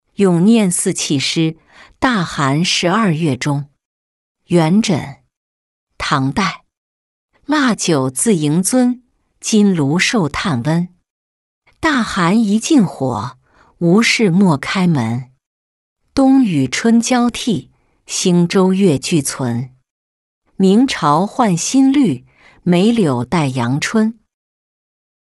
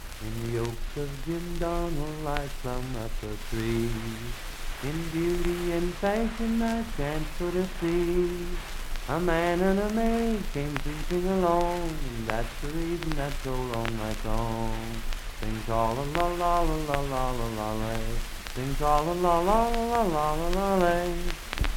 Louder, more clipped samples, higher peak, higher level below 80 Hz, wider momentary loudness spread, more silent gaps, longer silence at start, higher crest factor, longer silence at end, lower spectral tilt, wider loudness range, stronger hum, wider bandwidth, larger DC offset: first, -15 LUFS vs -29 LUFS; neither; first, -2 dBFS vs -6 dBFS; second, -48 dBFS vs -34 dBFS; about the same, 9 LU vs 11 LU; first, 3.85-4.35 s, 5.37-5.87 s, 6.77-7.29 s, 11.10-11.62 s, 15.46-15.96 s, 19.90-20.42 s vs none; first, 0.2 s vs 0 s; second, 14 dB vs 20 dB; first, 1.15 s vs 0 s; about the same, -5 dB/octave vs -5.5 dB/octave; about the same, 4 LU vs 6 LU; neither; second, 12 kHz vs 17 kHz; neither